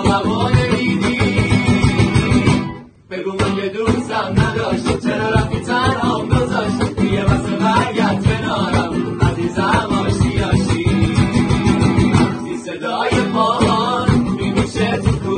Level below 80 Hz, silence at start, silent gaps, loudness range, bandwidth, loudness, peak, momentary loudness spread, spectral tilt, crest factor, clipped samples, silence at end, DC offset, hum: -30 dBFS; 0 s; none; 2 LU; 10 kHz; -16 LUFS; 0 dBFS; 5 LU; -6.5 dB/octave; 14 dB; under 0.1%; 0 s; under 0.1%; none